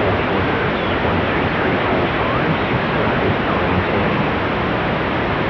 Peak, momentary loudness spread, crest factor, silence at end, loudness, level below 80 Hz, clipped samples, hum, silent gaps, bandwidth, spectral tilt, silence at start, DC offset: -6 dBFS; 2 LU; 12 dB; 0 s; -18 LUFS; -34 dBFS; under 0.1%; none; none; 5.4 kHz; -8 dB/octave; 0 s; under 0.1%